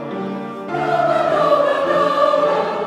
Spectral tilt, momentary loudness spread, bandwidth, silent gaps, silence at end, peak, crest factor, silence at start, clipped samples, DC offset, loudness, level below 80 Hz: -6 dB/octave; 10 LU; 12 kHz; none; 0 s; -4 dBFS; 14 dB; 0 s; under 0.1%; under 0.1%; -17 LUFS; -60 dBFS